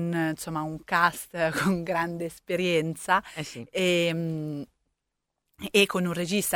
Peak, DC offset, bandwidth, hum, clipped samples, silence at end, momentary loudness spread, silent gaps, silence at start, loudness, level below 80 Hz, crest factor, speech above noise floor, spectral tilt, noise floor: -8 dBFS; under 0.1%; 19 kHz; none; under 0.1%; 0 s; 12 LU; none; 0 s; -27 LUFS; -60 dBFS; 20 dB; 56 dB; -4.5 dB/octave; -83 dBFS